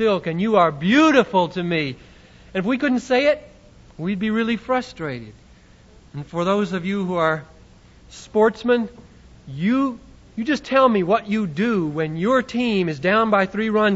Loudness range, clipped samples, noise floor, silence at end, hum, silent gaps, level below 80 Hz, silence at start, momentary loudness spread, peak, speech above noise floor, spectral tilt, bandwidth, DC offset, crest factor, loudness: 6 LU; under 0.1%; -49 dBFS; 0 s; none; none; -52 dBFS; 0 s; 13 LU; -2 dBFS; 29 dB; -6.5 dB/octave; 8 kHz; under 0.1%; 18 dB; -20 LUFS